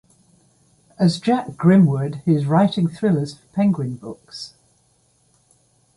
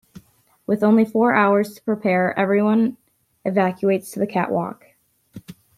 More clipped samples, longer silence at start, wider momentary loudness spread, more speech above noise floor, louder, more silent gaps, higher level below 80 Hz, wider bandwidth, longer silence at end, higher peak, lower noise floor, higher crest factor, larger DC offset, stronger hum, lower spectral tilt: neither; first, 1 s vs 0.7 s; first, 19 LU vs 9 LU; first, 43 dB vs 31 dB; about the same, -19 LUFS vs -20 LUFS; neither; first, -60 dBFS vs -66 dBFS; second, 11.5 kHz vs 14.5 kHz; first, 1.5 s vs 0.25 s; about the same, -4 dBFS vs -2 dBFS; first, -61 dBFS vs -50 dBFS; about the same, 18 dB vs 18 dB; neither; neither; about the same, -8 dB/octave vs -7.5 dB/octave